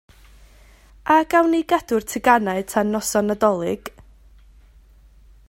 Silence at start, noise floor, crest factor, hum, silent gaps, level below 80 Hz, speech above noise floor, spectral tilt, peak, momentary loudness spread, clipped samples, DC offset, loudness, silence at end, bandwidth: 1.05 s; -50 dBFS; 22 dB; none; none; -50 dBFS; 31 dB; -4.5 dB/octave; 0 dBFS; 10 LU; under 0.1%; under 0.1%; -19 LUFS; 1.6 s; 16 kHz